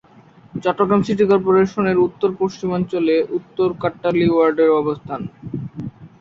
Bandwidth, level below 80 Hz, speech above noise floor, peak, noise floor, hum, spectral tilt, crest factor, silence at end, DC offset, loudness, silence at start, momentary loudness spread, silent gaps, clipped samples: 7.6 kHz; -52 dBFS; 30 dB; -2 dBFS; -47 dBFS; none; -8 dB/octave; 16 dB; 0.15 s; under 0.1%; -18 LUFS; 0.55 s; 15 LU; none; under 0.1%